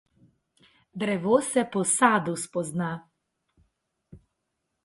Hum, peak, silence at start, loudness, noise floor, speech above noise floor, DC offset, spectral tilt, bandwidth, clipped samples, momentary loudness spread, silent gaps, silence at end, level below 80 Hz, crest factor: none; -6 dBFS; 0.95 s; -25 LUFS; -80 dBFS; 55 dB; under 0.1%; -4 dB/octave; 12 kHz; under 0.1%; 12 LU; none; 0.7 s; -68 dBFS; 22 dB